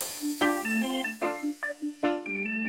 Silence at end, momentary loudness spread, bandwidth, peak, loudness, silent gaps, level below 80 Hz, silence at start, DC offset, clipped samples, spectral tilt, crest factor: 0 s; 6 LU; 17 kHz; -10 dBFS; -30 LUFS; none; -74 dBFS; 0 s; under 0.1%; under 0.1%; -3 dB/octave; 20 dB